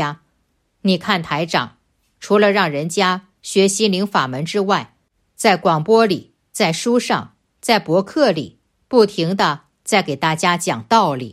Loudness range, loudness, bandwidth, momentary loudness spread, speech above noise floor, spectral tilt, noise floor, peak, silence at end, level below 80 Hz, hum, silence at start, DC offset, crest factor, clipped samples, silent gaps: 1 LU; -17 LUFS; 15.5 kHz; 9 LU; 49 dB; -4.5 dB/octave; -66 dBFS; 0 dBFS; 0 s; -62 dBFS; none; 0 s; under 0.1%; 18 dB; under 0.1%; none